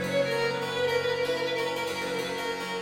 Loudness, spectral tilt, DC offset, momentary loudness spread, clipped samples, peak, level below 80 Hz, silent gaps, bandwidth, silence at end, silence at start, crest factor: -28 LUFS; -3.5 dB/octave; under 0.1%; 4 LU; under 0.1%; -14 dBFS; -64 dBFS; none; 16 kHz; 0 s; 0 s; 14 dB